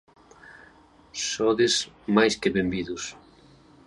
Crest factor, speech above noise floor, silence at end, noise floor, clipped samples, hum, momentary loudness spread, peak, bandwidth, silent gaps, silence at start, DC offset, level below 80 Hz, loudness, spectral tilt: 22 dB; 30 dB; 0.75 s; -55 dBFS; under 0.1%; none; 13 LU; -6 dBFS; 11.5 kHz; none; 0.5 s; under 0.1%; -56 dBFS; -24 LUFS; -3.5 dB/octave